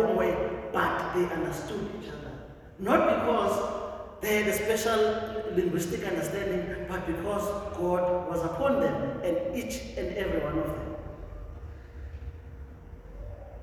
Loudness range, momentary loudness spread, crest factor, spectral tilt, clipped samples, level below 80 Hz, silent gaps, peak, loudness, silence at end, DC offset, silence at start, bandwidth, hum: 8 LU; 18 LU; 22 dB; -5.5 dB/octave; under 0.1%; -46 dBFS; none; -8 dBFS; -29 LUFS; 0 s; under 0.1%; 0 s; 17 kHz; none